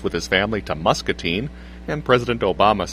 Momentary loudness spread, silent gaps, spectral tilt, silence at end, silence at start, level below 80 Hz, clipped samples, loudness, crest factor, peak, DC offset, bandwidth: 10 LU; none; -5 dB/octave; 0 s; 0 s; -38 dBFS; under 0.1%; -20 LUFS; 20 dB; 0 dBFS; under 0.1%; 15.5 kHz